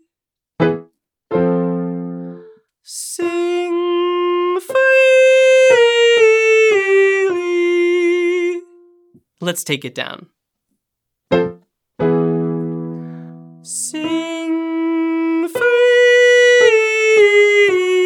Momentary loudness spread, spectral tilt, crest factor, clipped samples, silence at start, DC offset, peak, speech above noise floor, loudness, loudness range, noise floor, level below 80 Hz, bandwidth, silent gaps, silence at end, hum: 16 LU; -4.5 dB/octave; 14 dB; under 0.1%; 0.6 s; under 0.1%; 0 dBFS; 62 dB; -14 LUFS; 11 LU; -85 dBFS; -60 dBFS; 15 kHz; none; 0 s; none